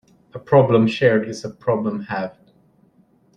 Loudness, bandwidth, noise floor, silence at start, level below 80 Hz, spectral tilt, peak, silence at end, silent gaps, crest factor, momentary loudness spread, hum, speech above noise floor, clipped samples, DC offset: -19 LUFS; 9.8 kHz; -57 dBFS; 0.35 s; -58 dBFS; -7 dB/octave; -2 dBFS; 1.05 s; none; 18 dB; 17 LU; none; 39 dB; under 0.1%; under 0.1%